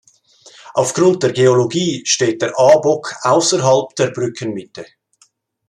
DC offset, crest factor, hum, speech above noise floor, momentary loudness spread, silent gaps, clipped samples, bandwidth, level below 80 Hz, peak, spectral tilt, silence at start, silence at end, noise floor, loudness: under 0.1%; 16 dB; none; 42 dB; 13 LU; none; under 0.1%; 11.5 kHz; -60 dBFS; 0 dBFS; -4 dB/octave; 0.65 s; 0.85 s; -57 dBFS; -15 LUFS